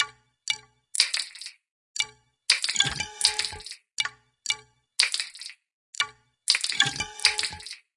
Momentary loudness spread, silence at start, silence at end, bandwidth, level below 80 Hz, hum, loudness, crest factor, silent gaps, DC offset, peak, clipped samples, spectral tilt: 16 LU; 0 s; 0.2 s; 11.5 kHz; -60 dBFS; none; -26 LUFS; 30 dB; 1.71-1.94 s, 5.74-5.93 s; under 0.1%; 0 dBFS; under 0.1%; 1 dB/octave